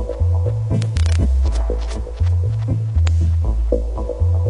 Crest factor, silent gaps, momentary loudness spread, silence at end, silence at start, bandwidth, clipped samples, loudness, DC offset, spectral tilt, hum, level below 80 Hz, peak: 12 dB; none; 5 LU; 0 s; 0 s; 10 kHz; under 0.1%; -19 LUFS; under 0.1%; -7.5 dB/octave; none; -22 dBFS; -4 dBFS